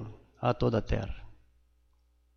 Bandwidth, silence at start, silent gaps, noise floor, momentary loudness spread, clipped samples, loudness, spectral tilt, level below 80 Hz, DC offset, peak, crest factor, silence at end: 6.8 kHz; 0 s; none; -67 dBFS; 18 LU; under 0.1%; -31 LUFS; -8 dB/octave; -44 dBFS; under 0.1%; -14 dBFS; 20 dB; 1.05 s